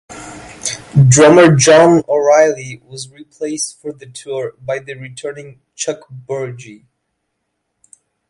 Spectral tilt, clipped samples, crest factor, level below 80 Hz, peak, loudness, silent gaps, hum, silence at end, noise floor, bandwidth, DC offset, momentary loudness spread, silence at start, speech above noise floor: -5 dB/octave; under 0.1%; 14 dB; -48 dBFS; 0 dBFS; -12 LUFS; none; none; 1.55 s; -72 dBFS; 11.5 kHz; under 0.1%; 24 LU; 0.1 s; 59 dB